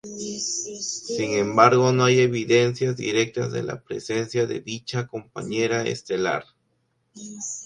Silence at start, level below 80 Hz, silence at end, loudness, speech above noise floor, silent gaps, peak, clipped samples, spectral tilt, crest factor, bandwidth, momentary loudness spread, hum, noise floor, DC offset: 0.05 s; -62 dBFS; 0 s; -23 LUFS; 47 dB; none; -2 dBFS; under 0.1%; -4.5 dB/octave; 22 dB; 10 kHz; 14 LU; none; -70 dBFS; under 0.1%